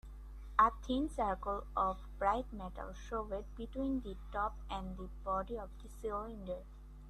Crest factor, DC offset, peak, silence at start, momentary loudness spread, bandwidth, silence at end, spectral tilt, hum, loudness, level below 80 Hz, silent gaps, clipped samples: 24 dB; under 0.1%; -14 dBFS; 0.05 s; 14 LU; 13 kHz; 0 s; -6.5 dB/octave; none; -39 LUFS; -48 dBFS; none; under 0.1%